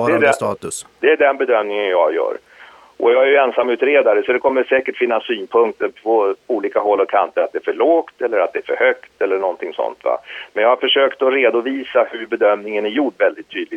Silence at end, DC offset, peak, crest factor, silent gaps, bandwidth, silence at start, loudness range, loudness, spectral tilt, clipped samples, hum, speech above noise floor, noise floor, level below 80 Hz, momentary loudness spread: 0 s; under 0.1%; 0 dBFS; 16 dB; none; 12.5 kHz; 0 s; 2 LU; -17 LUFS; -3.5 dB/octave; under 0.1%; none; 26 dB; -43 dBFS; -66 dBFS; 8 LU